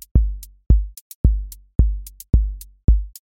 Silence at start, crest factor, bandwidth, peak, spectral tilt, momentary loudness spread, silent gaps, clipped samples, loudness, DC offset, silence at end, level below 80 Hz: 0.15 s; 16 dB; 17 kHz; -2 dBFS; -8.5 dB/octave; 10 LU; 1.01-1.24 s, 1.75-1.79 s, 2.84-2.88 s; under 0.1%; -22 LUFS; under 0.1%; 0.15 s; -20 dBFS